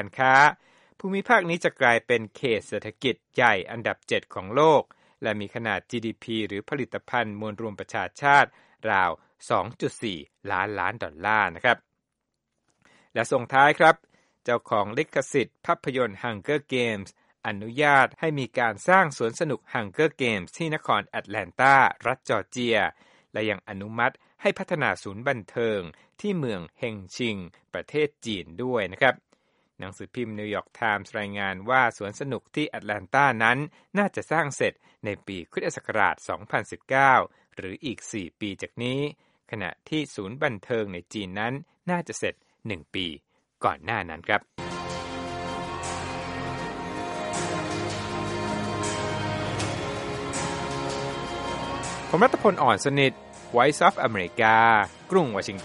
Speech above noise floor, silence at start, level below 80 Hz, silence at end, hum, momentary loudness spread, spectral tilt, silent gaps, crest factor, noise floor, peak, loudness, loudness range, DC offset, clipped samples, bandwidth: 56 dB; 0 s; -58 dBFS; 0 s; none; 14 LU; -4.5 dB/octave; none; 24 dB; -81 dBFS; -2 dBFS; -25 LUFS; 7 LU; under 0.1%; under 0.1%; 11.5 kHz